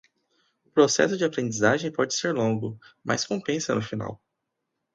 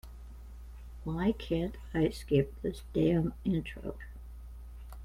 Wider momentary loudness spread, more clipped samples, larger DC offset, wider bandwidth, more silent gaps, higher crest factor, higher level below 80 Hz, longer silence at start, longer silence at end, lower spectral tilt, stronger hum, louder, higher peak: second, 12 LU vs 21 LU; neither; neither; second, 9.4 kHz vs 15.5 kHz; neither; about the same, 22 dB vs 20 dB; second, -64 dBFS vs -46 dBFS; first, 0.75 s vs 0.05 s; first, 0.8 s vs 0 s; second, -4 dB/octave vs -8 dB/octave; neither; first, -25 LUFS vs -33 LUFS; first, -6 dBFS vs -14 dBFS